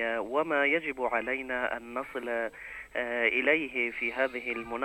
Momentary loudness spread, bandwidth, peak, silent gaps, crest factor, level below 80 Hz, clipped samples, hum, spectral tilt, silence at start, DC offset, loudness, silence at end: 10 LU; 16.5 kHz; -12 dBFS; none; 20 dB; -62 dBFS; under 0.1%; none; -4.5 dB/octave; 0 s; under 0.1%; -30 LUFS; 0 s